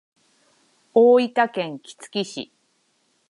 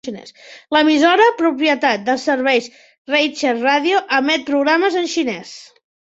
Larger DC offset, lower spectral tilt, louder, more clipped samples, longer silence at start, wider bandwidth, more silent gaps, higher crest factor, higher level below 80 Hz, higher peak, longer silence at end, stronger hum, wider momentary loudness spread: neither; first, -5 dB/octave vs -3 dB/octave; second, -20 LUFS vs -16 LUFS; neither; first, 0.95 s vs 0.05 s; first, 11.5 kHz vs 8 kHz; second, none vs 2.98-3.05 s; about the same, 18 dB vs 16 dB; second, -78 dBFS vs -66 dBFS; about the same, -4 dBFS vs -2 dBFS; first, 0.85 s vs 0.5 s; neither; first, 20 LU vs 11 LU